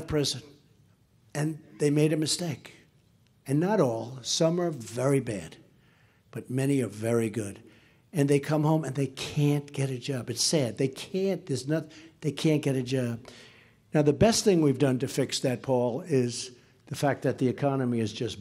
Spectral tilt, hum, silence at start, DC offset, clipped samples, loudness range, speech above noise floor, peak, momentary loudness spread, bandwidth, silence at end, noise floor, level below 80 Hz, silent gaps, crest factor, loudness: -5.5 dB/octave; none; 0 s; under 0.1%; under 0.1%; 4 LU; 36 dB; -10 dBFS; 12 LU; 15.5 kHz; 0 s; -63 dBFS; -58 dBFS; none; 18 dB; -28 LUFS